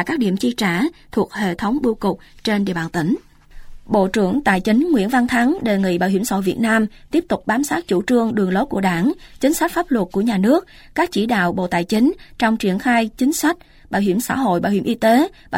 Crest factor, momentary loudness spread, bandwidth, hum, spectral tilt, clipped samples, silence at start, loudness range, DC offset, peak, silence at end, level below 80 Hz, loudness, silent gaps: 16 dB; 5 LU; 16.5 kHz; none; -5.5 dB/octave; under 0.1%; 0 s; 3 LU; under 0.1%; -4 dBFS; 0 s; -46 dBFS; -19 LUFS; none